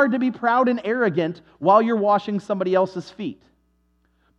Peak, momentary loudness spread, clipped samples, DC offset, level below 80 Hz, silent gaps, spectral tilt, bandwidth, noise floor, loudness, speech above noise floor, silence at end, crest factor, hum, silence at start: -4 dBFS; 13 LU; under 0.1%; under 0.1%; -66 dBFS; none; -7.5 dB/octave; 8.2 kHz; -65 dBFS; -21 LUFS; 44 dB; 1.05 s; 18 dB; none; 0 s